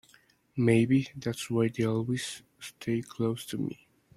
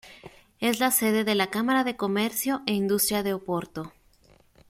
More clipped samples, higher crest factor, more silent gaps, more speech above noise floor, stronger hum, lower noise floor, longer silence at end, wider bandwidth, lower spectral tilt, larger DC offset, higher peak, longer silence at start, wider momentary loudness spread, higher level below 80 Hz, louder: neither; about the same, 18 dB vs 18 dB; neither; about the same, 34 dB vs 34 dB; neither; first, -63 dBFS vs -59 dBFS; second, 0.4 s vs 0.8 s; about the same, 15.5 kHz vs 16.5 kHz; first, -6.5 dB/octave vs -3.5 dB/octave; neither; second, -12 dBFS vs -8 dBFS; first, 0.55 s vs 0.05 s; first, 15 LU vs 9 LU; about the same, -62 dBFS vs -62 dBFS; second, -30 LUFS vs -25 LUFS